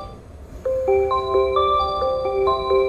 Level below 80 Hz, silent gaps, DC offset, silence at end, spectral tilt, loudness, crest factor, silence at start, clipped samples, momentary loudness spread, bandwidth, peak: -40 dBFS; none; 0.1%; 0 s; -6.5 dB/octave; -20 LUFS; 14 dB; 0 s; under 0.1%; 10 LU; 7 kHz; -8 dBFS